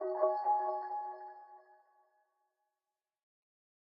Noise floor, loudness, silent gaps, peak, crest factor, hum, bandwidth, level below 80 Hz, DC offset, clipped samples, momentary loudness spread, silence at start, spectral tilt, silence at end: under -90 dBFS; -35 LUFS; none; -18 dBFS; 20 dB; none; 5.4 kHz; under -90 dBFS; under 0.1%; under 0.1%; 19 LU; 0 s; -1 dB/octave; 2.4 s